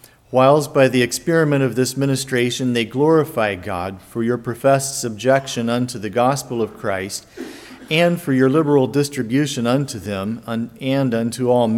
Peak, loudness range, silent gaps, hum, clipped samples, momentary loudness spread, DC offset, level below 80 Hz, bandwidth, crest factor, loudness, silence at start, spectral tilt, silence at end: -2 dBFS; 3 LU; none; none; under 0.1%; 10 LU; under 0.1%; -56 dBFS; 17 kHz; 18 dB; -19 LUFS; 0.3 s; -5.5 dB/octave; 0 s